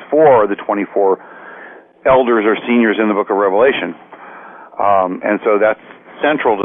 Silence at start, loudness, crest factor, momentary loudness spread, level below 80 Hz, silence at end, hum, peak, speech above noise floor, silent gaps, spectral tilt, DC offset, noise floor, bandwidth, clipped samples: 0 s; -14 LUFS; 12 dB; 22 LU; -52 dBFS; 0 s; none; -4 dBFS; 24 dB; none; -9 dB/octave; under 0.1%; -37 dBFS; 3.7 kHz; under 0.1%